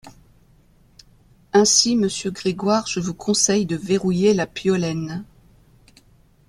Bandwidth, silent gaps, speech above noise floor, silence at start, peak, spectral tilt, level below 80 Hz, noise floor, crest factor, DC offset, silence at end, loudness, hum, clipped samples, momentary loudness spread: 13 kHz; none; 34 dB; 0.05 s; -4 dBFS; -3.5 dB/octave; -54 dBFS; -55 dBFS; 18 dB; under 0.1%; 1.25 s; -19 LUFS; none; under 0.1%; 11 LU